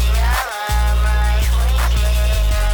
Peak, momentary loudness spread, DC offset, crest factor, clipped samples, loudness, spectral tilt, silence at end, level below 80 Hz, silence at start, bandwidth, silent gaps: -8 dBFS; 2 LU; under 0.1%; 6 dB; under 0.1%; -18 LUFS; -4 dB/octave; 0 s; -16 dBFS; 0 s; 19.5 kHz; none